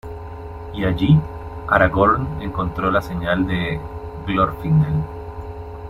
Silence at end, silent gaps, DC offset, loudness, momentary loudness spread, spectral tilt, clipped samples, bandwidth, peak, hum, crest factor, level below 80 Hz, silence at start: 0 s; none; under 0.1%; -19 LUFS; 17 LU; -8.5 dB/octave; under 0.1%; 12 kHz; -2 dBFS; none; 18 dB; -36 dBFS; 0.05 s